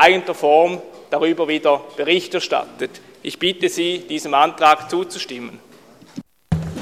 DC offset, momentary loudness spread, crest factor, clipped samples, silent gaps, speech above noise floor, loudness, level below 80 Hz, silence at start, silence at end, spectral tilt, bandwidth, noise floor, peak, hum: under 0.1%; 18 LU; 18 dB; under 0.1%; none; 27 dB; -19 LUFS; -48 dBFS; 0 s; 0 s; -4.5 dB/octave; 15 kHz; -46 dBFS; 0 dBFS; none